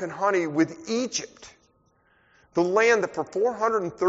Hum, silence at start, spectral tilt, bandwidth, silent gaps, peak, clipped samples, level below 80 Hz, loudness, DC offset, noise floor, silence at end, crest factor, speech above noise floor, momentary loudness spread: none; 0 s; -3.5 dB/octave; 8 kHz; none; -8 dBFS; under 0.1%; -66 dBFS; -25 LUFS; under 0.1%; -64 dBFS; 0 s; 18 dB; 40 dB; 10 LU